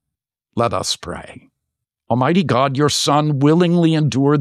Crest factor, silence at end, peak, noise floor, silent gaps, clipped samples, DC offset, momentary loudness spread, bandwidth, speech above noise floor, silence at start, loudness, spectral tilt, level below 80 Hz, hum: 14 dB; 0 s; -4 dBFS; -83 dBFS; none; under 0.1%; under 0.1%; 10 LU; 14 kHz; 67 dB; 0.55 s; -16 LUFS; -5.5 dB/octave; -52 dBFS; none